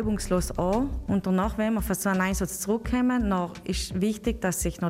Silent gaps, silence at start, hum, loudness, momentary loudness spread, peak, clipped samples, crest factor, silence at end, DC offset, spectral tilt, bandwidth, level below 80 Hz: none; 0 s; none; -27 LUFS; 4 LU; -12 dBFS; under 0.1%; 14 dB; 0 s; under 0.1%; -5.5 dB/octave; 16 kHz; -38 dBFS